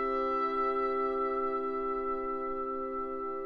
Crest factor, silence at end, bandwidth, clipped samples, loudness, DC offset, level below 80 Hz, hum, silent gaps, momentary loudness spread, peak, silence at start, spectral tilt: 10 dB; 0 s; 4.9 kHz; under 0.1%; -32 LUFS; under 0.1%; -56 dBFS; none; none; 5 LU; -22 dBFS; 0 s; -6.5 dB/octave